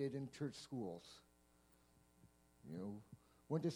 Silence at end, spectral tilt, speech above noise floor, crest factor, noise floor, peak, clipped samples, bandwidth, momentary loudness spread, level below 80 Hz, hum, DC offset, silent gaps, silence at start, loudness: 0 s; -7 dB/octave; 25 dB; 20 dB; -73 dBFS; -28 dBFS; under 0.1%; 19.5 kHz; 19 LU; -78 dBFS; none; under 0.1%; none; 0 s; -49 LUFS